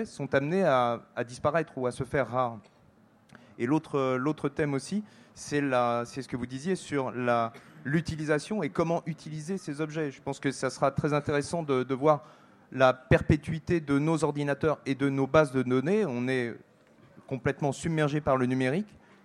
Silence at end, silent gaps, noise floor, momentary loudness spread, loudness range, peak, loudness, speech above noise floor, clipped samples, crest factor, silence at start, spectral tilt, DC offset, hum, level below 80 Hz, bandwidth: 0.4 s; none; -61 dBFS; 10 LU; 4 LU; -8 dBFS; -29 LUFS; 32 dB; under 0.1%; 22 dB; 0 s; -6.5 dB/octave; under 0.1%; none; -54 dBFS; 12 kHz